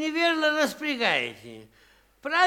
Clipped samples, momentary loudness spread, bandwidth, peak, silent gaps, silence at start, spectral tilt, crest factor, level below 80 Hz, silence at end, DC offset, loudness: under 0.1%; 19 LU; 18 kHz; -8 dBFS; none; 0 s; -2.5 dB/octave; 20 dB; -68 dBFS; 0 s; under 0.1%; -25 LUFS